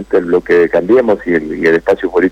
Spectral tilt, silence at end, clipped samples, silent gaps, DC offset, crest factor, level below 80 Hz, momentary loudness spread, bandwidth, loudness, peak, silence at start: -7 dB/octave; 0 s; under 0.1%; none; under 0.1%; 8 dB; -42 dBFS; 3 LU; 8.4 kHz; -12 LUFS; -4 dBFS; 0 s